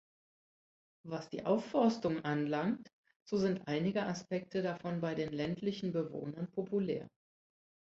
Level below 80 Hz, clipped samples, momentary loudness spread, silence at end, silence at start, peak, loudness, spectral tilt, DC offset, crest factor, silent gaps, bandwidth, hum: -72 dBFS; under 0.1%; 10 LU; 0.8 s; 1.05 s; -18 dBFS; -36 LUFS; -6 dB/octave; under 0.1%; 18 dB; 2.93-3.04 s, 3.16-3.26 s; 7.8 kHz; none